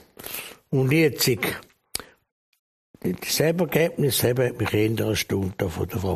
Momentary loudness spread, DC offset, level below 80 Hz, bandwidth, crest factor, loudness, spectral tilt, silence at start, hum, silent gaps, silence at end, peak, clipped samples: 13 LU; under 0.1%; -52 dBFS; 15.5 kHz; 20 dB; -24 LUFS; -5 dB/octave; 0.2 s; none; 2.32-2.52 s, 2.59-2.94 s; 0 s; -6 dBFS; under 0.1%